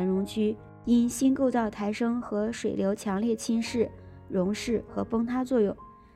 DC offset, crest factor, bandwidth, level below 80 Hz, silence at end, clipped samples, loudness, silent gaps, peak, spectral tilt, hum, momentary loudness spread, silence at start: under 0.1%; 14 dB; 14 kHz; -56 dBFS; 0.25 s; under 0.1%; -28 LUFS; none; -14 dBFS; -6 dB/octave; none; 6 LU; 0 s